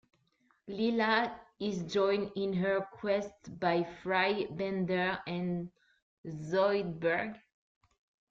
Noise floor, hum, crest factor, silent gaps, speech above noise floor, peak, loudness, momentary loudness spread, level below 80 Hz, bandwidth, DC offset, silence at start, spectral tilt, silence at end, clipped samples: -73 dBFS; none; 18 dB; 6.02-6.24 s; 41 dB; -16 dBFS; -33 LUFS; 11 LU; -68 dBFS; 7.6 kHz; under 0.1%; 0.65 s; -6.5 dB/octave; 0.9 s; under 0.1%